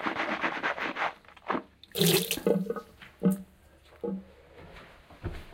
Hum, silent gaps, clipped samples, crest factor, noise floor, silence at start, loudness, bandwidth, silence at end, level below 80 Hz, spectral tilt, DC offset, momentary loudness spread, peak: none; none; under 0.1%; 24 dB; -57 dBFS; 0 s; -30 LUFS; 17 kHz; 0 s; -54 dBFS; -4 dB/octave; under 0.1%; 23 LU; -8 dBFS